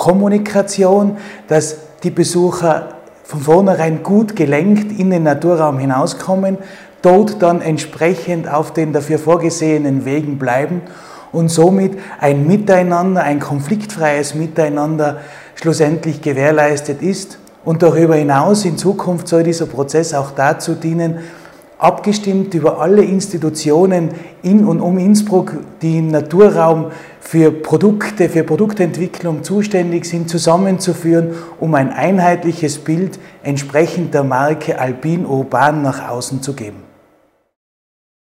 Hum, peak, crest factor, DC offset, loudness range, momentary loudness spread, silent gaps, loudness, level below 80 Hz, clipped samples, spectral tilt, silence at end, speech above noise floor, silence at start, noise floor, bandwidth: none; 0 dBFS; 14 dB; under 0.1%; 3 LU; 10 LU; none; -14 LUFS; -56 dBFS; under 0.1%; -6.5 dB/octave; 1.45 s; 41 dB; 0 s; -55 dBFS; 15.5 kHz